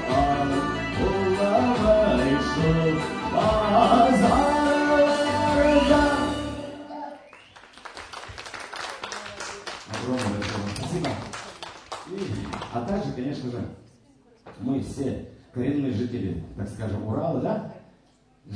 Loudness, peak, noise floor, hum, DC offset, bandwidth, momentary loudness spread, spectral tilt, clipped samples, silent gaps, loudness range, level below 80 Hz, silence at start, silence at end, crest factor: -24 LUFS; -6 dBFS; -60 dBFS; none; under 0.1%; 10.5 kHz; 18 LU; -6 dB/octave; under 0.1%; none; 13 LU; -42 dBFS; 0 s; 0 s; 20 dB